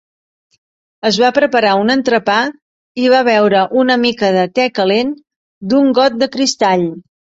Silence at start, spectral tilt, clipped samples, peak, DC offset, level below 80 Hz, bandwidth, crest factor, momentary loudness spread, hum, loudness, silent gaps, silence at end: 1.05 s; -4.5 dB/octave; under 0.1%; -2 dBFS; under 0.1%; -58 dBFS; 8 kHz; 12 dB; 9 LU; none; -13 LUFS; 2.62-2.95 s, 5.36-5.61 s; 0.4 s